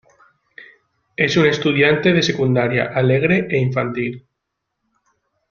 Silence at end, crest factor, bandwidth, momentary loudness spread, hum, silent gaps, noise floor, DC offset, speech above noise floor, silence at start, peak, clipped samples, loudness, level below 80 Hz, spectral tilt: 1.3 s; 18 dB; 7.2 kHz; 10 LU; none; none; -77 dBFS; under 0.1%; 61 dB; 0.6 s; 0 dBFS; under 0.1%; -17 LUFS; -54 dBFS; -6 dB/octave